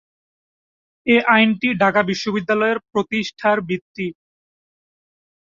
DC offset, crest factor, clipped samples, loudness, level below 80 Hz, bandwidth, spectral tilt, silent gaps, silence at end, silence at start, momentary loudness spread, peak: under 0.1%; 18 dB; under 0.1%; -18 LUFS; -62 dBFS; 7.4 kHz; -5.5 dB/octave; 3.81-3.95 s; 1.4 s; 1.05 s; 13 LU; -2 dBFS